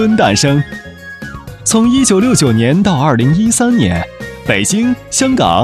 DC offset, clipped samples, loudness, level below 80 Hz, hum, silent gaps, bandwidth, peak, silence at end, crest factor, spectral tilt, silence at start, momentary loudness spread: under 0.1%; under 0.1%; -11 LUFS; -36 dBFS; none; none; 13.5 kHz; 0 dBFS; 0 s; 12 dB; -4.5 dB/octave; 0 s; 17 LU